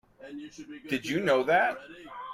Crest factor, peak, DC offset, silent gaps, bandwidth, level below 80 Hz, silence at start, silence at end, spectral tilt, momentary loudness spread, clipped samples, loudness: 18 dB; -12 dBFS; under 0.1%; none; 15.5 kHz; -68 dBFS; 0.2 s; 0 s; -5 dB/octave; 21 LU; under 0.1%; -27 LUFS